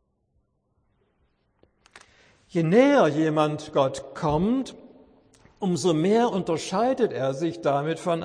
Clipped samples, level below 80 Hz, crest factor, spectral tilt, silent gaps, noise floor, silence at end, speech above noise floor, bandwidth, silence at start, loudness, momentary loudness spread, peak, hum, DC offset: under 0.1%; -56 dBFS; 20 dB; -6 dB/octave; none; -70 dBFS; 0 s; 48 dB; 10.5 kHz; 2.55 s; -24 LUFS; 9 LU; -6 dBFS; none; under 0.1%